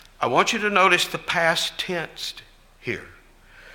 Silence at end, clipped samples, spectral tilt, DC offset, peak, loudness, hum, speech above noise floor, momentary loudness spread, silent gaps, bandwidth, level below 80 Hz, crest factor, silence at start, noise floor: 0 s; under 0.1%; -2.5 dB/octave; under 0.1%; -2 dBFS; -22 LUFS; none; 27 dB; 15 LU; none; 17 kHz; -54 dBFS; 22 dB; 0.2 s; -50 dBFS